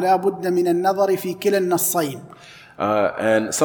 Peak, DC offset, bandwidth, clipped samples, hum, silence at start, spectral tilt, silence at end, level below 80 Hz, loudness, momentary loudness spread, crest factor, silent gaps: -4 dBFS; under 0.1%; 19 kHz; under 0.1%; none; 0 s; -4.5 dB/octave; 0 s; -64 dBFS; -20 LUFS; 5 LU; 16 dB; none